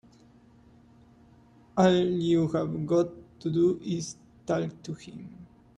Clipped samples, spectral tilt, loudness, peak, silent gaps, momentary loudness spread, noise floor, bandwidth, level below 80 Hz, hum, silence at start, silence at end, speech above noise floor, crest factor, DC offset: under 0.1%; -6.5 dB/octave; -27 LUFS; -10 dBFS; none; 18 LU; -57 dBFS; 10 kHz; -62 dBFS; none; 1.75 s; 0.3 s; 30 dB; 18 dB; under 0.1%